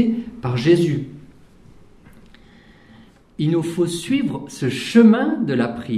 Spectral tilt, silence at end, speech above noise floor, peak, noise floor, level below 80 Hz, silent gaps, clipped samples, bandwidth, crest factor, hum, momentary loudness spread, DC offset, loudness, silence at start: -6.5 dB/octave; 0 s; 30 dB; -2 dBFS; -48 dBFS; -54 dBFS; none; under 0.1%; 13 kHz; 18 dB; none; 12 LU; under 0.1%; -19 LUFS; 0 s